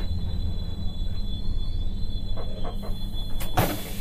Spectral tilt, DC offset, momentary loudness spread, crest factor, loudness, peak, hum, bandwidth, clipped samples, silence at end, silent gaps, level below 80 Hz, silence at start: -5.5 dB/octave; under 0.1%; 8 LU; 16 dB; -32 LUFS; -8 dBFS; none; 15.5 kHz; under 0.1%; 0 s; none; -28 dBFS; 0 s